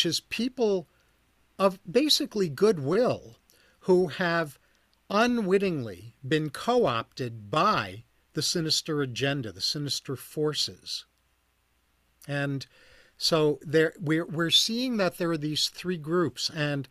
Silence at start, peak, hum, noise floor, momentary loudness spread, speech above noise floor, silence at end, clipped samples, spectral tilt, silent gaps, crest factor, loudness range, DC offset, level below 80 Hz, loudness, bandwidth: 0 s; -8 dBFS; none; -70 dBFS; 12 LU; 43 dB; 0.05 s; under 0.1%; -4 dB/octave; none; 20 dB; 6 LU; under 0.1%; -64 dBFS; -27 LUFS; 15.5 kHz